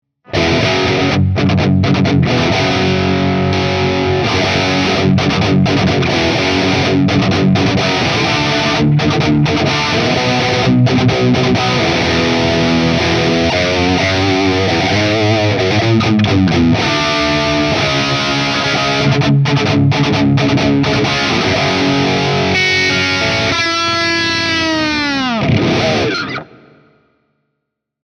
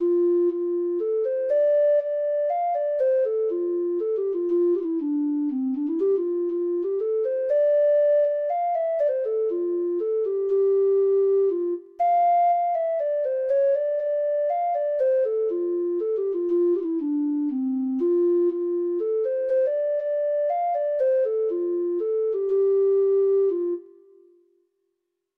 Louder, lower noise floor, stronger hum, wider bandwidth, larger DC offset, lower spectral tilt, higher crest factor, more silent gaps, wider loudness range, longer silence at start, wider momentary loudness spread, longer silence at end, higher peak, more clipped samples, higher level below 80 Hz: first, -13 LUFS vs -23 LUFS; about the same, -75 dBFS vs -78 dBFS; neither; first, 10 kHz vs 3.4 kHz; neither; second, -5.5 dB/octave vs -8 dB/octave; about the same, 12 dB vs 8 dB; neither; about the same, 1 LU vs 2 LU; first, 0.3 s vs 0 s; second, 2 LU vs 5 LU; about the same, 1.6 s vs 1.55 s; first, 0 dBFS vs -14 dBFS; neither; first, -38 dBFS vs -76 dBFS